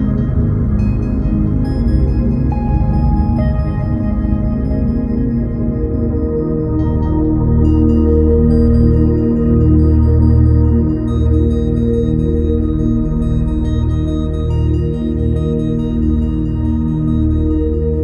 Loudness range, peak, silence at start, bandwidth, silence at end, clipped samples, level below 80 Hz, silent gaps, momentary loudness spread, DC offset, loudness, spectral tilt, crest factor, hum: 5 LU; 0 dBFS; 0 s; 5.4 kHz; 0 s; under 0.1%; -18 dBFS; none; 6 LU; under 0.1%; -15 LUFS; -11 dB/octave; 12 dB; none